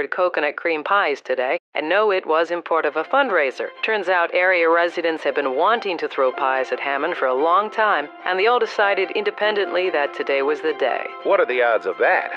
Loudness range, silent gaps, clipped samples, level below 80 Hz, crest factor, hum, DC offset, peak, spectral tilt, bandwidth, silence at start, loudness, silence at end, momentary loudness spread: 1 LU; 1.60-1.72 s; under 0.1%; under -90 dBFS; 16 dB; none; under 0.1%; -4 dBFS; -4 dB/octave; 8 kHz; 0 s; -20 LUFS; 0 s; 5 LU